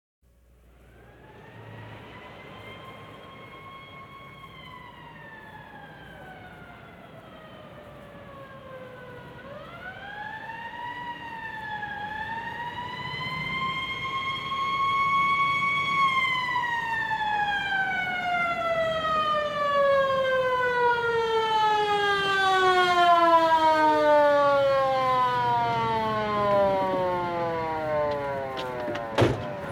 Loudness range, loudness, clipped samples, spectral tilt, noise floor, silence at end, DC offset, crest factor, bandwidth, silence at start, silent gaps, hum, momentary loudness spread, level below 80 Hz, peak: 23 LU; -24 LUFS; under 0.1%; -5 dB/octave; -57 dBFS; 0 s; under 0.1%; 18 dB; 16.5 kHz; 1.25 s; none; none; 24 LU; -56 dBFS; -8 dBFS